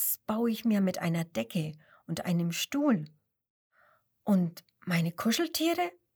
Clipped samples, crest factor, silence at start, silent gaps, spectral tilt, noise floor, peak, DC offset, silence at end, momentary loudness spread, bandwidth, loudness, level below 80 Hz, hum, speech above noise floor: under 0.1%; 16 dB; 0 s; 3.50-3.70 s; -5 dB/octave; -67 dBFS; -16 dBFS; under 0.1%; 0.25 s; 9 LU; over 20 kHz; -30 LUFS; -72 dBFS; none; 38 dB